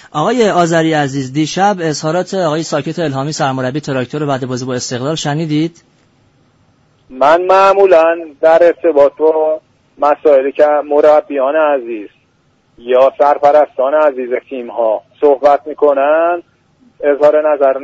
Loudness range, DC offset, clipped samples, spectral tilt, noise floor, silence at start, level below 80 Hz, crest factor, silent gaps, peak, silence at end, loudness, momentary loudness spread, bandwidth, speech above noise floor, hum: 7 LU; under 0.1%; under 0.1%; -5.5 dB/octave; -55 dBFS; 0.15 s; -56 dBFS; 12 dB; none; 0 dBFS; 0 s; -12 LUFS; 10 LU; 8 kHz; 44 dB; none